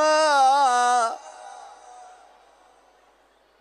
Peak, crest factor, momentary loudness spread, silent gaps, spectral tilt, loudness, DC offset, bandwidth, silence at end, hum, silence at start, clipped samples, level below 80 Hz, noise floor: -8 dBFS; 16 dB; 25 LU; none; 1 dB/octave; -19 LUFS; under 0.1%; 12 kHz; 1.95 s; none; 0 s; under 0.1%; -78 dBFS; -60 dBFS